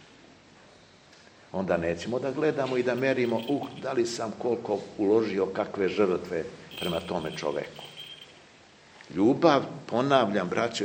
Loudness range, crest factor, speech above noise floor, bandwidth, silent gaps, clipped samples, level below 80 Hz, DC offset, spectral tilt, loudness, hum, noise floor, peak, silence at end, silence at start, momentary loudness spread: 4 LU; 22 dB; 28 dB; 16 kHz; none; under 0.1%; -64 dBFS; under 0.1%; -5.5 dB/octave; -28 LUFS; none; -55 dBFS; -6 dBFS; 0 s; 1.55 s; 13 LU